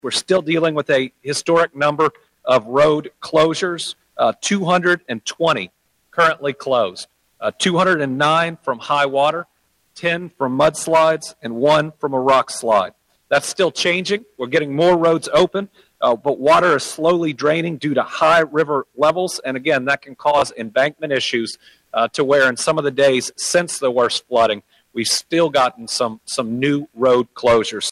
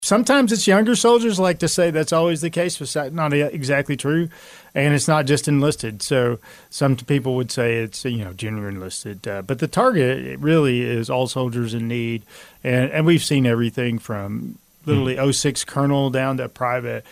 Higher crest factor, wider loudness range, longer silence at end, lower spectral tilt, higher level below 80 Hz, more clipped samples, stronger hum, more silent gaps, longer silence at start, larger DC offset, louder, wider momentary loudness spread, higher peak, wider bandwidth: about the same, 16 dB vs 16 dB; about the same, 2 LU vs 4 LU; about the same, 0 s vs 0.1 s; about the same, -4 dB/octave vs -5 dB/octave; about the same, -56 dBFS vs -54 dBFS; neither; neither; neither; about the same, 0.05 s vs 0 s; neither; about the same, -18 LUFS vs -20 LUFS; second, 8 LU vs 12 LU; about the same, -2 dBFS vs -4 dBFS; second, 14 kHz vs 16 kHz